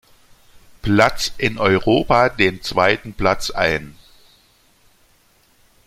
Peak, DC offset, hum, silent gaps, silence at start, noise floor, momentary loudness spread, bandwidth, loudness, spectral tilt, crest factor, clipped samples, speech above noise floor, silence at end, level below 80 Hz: 0 dBFS; under 0.1%; none; none; 0.85 s; -56 dBFS; 6 LU; 16 kHz; -18 LUFS; -5 dB/octave; 20 dB; under 0.1%; 39 dB; 1.95 s; -40 dBFS